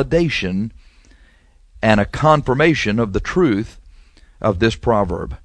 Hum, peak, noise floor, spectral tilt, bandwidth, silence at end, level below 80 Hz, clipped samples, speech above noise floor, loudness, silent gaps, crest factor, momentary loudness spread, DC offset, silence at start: none; 0 dBFS; -51 dBFS; -6.5 dB/octave; 10.5 kHz; 0.1 s; -36 dBFS; under 0.1%; 34 dB; -17 LUFS; none; 18 dB; 8 LU; under 0.1%; 0 s